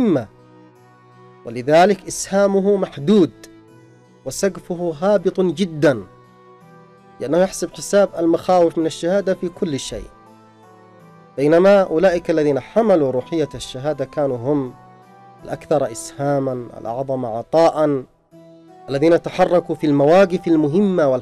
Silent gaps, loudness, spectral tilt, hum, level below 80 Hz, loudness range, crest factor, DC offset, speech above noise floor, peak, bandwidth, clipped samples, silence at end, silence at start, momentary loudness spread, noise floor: none; -18 LUFS; -6 dB/octave; none; -50 dBFS; 4 LU; 12 dB; under 0.1%; 31 dB; -6 dBFS; 14.5 kHz; under 0.1%; 0 s; 0 s; 13 LU; -48 dBFS